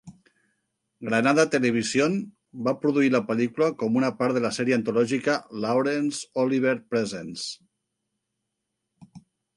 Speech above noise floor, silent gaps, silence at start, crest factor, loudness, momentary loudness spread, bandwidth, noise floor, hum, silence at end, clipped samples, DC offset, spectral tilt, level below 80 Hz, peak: 57 dB; none; 0.05 s; 20 dB; -24 LUFS; 10 LU; 11.5 kHz; -81 dBFS; none; 0.4 s; under 0.1%; under 0.1%; -5 dB/octave; -70 dBFS; -6 dBFS